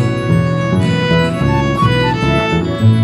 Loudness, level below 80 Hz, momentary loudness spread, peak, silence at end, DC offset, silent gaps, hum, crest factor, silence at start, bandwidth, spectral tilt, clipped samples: -14 LUFS; -30 dBFS; 2 LU; 0 dBFS; 0 s; under 0.1%; none; none; 12 dB; 0 s; 11.5 kHz; -7 dB/octave; under 0.1%